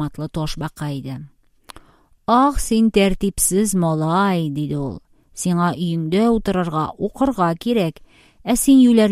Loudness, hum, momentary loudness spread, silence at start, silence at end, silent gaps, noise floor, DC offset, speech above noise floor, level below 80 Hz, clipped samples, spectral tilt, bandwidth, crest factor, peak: -19 LUFS; none; 13 LU; 0 s; 0 s; none; -50 dBFS; under 0.1%; 32 dB; -38 dBFS; under 0.1%; -5.5 dB/octave; 15.5 kHz; 16 dB; -2 dBFS